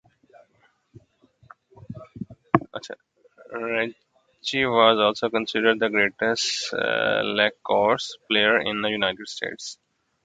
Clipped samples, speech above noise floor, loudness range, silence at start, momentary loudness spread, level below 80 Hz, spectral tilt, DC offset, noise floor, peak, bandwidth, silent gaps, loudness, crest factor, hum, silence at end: under 0.1%; 41 dB; 11 LU; 1.9 s; 19 LU; -62 dBFS; -3.5 dB/octave; under 0.1%; -64 dBFS; 0 dBFS; 9.4 kHz; none; -22 LUFS; 24 dB; none; 0.5 s